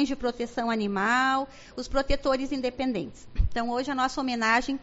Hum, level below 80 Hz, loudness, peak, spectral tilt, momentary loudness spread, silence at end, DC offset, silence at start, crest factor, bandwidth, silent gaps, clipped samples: none; -38 dBFS; -27 LUFS; -10 dBFS; -3 dB/octave; 8 LU; 0 s; under 0.1%; 0 s; 16 dB; 8 kHz; none; under 0.1%